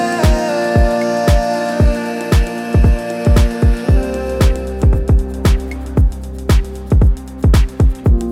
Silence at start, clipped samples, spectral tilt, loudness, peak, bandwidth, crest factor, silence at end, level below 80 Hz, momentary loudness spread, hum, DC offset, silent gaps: 0 s; under 0.1%; -7 dB/octave; -15 LUFS; 0 dBFS; 14.5 kHz; 12 dB; 0 s; -16 dBFS; 4 LU; none; under 0.1%; none